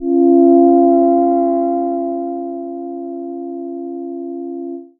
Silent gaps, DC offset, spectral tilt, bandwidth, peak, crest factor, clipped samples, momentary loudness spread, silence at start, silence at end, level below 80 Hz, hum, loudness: none; under 0.1%; -14.5 dB/octave; 2.1 kHz; 0 dBFS; 14 dB; under 0.1%; 16 LU; 0 s; 0.15 s; -58 dBFS; none; -13 LUFS